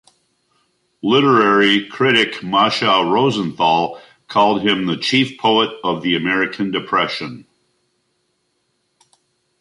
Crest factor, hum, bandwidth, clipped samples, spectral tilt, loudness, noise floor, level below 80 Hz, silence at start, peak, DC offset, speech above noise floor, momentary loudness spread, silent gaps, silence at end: 18 dB; none; 11.5 kHz; under 0.1%; -5 dB/octave; -16 LUFS; -68 dBFS; -60 dBFS; 1.05 s; 0 dBFS; under 0.1%; 52 dB; 9 LU; none; 2.2 s